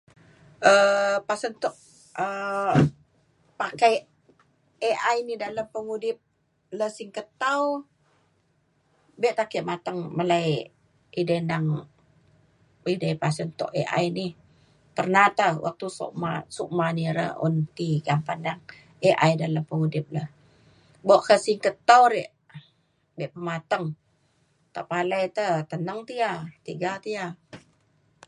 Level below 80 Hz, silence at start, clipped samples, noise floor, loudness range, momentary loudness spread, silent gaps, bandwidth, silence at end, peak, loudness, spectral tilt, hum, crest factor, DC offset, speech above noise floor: -64 dBFS; 0.6 s; under 0.1%; -68 dBFS; 7 LU; 15 LU; none; 11.5 kHz; 0.7 s; -2 dBFS; -25 LUFS; -5.5 dB/octave; none; 24 dB; under 0.1%; 43 dB